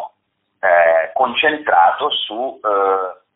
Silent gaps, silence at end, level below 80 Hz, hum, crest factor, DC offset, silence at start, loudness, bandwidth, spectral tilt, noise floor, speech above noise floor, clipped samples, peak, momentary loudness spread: none; 0.2 s; -64 dBFS; none; 14 dB; under 0.1%; 0 s; -16 LUFS; 4 kHz; 1.5 dB/octave; -69 dBFS; 52 dB; under 0.1%; -2 dBFS; 8 LU